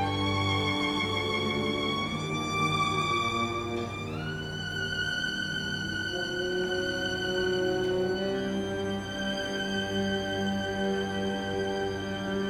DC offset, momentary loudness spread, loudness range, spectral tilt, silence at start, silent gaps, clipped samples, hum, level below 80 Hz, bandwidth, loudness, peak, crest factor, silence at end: under 0.1%; 5 LU; 3 LU; -4.5 dB/octave; 0 s; none; under 0.1%; none; -52 dBFS; 16 kHz; -30 LUFS; -16 dBFS; 14 dB; 0 s